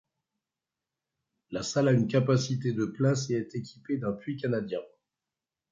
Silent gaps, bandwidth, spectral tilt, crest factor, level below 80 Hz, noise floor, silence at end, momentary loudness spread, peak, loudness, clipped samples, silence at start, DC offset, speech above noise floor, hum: none; 7.8 kHz; -6.5 dB/octave; 20 dB; -66 dBFS; -90 dBFS; 0.85 s; 12 LU; -10 dBFS; -29 LUFS; under 0.1%; 1.5 s; under 0.1%; 62 dB; none